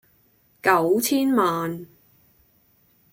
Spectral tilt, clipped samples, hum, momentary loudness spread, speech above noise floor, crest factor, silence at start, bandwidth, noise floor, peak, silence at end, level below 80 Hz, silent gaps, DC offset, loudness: -4.5 dB/octave; under 0.1%; none; 11 LU; 41 dB; 20 dB; 0.65 s; 16.5 kHz; -61 dBFS; -6 dBFS; 1.25 s; -66 dBFS; none; under 0.1%; -21 LUFS